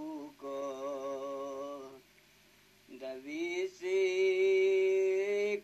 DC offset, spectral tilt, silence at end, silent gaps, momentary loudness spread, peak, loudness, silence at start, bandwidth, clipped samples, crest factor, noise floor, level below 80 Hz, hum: under 0.1%; -3.5 dB/octave; 0 s; none; 16 LU; -22 dBFS; -33 LUFS; 0 s; 12.5 kHz; under 0.1%; 12 dB; -64 dBFS; -80 dBFS; 50 Hz at -75 dBFS